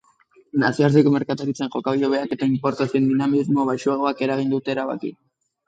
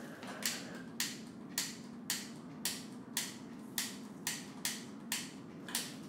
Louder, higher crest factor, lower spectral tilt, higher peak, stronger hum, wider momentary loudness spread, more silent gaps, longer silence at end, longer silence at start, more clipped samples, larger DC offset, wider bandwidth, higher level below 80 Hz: first, -21 LUFS vs -41 LUFS; second, 18 dB vs 26 dB; first, -7 dB/octave vs -1.5 dB/octave; first, -4 dBFS vs -16 dBFS; neither; about the same, 8 LU vs 9 LU; neither; first, 0.55 s vs 0 s; first, 0.55 s vs 0 s; neither; neither; second, 8 kHz vs 17 kHz; first, -66 dBFS vs -82 dBFS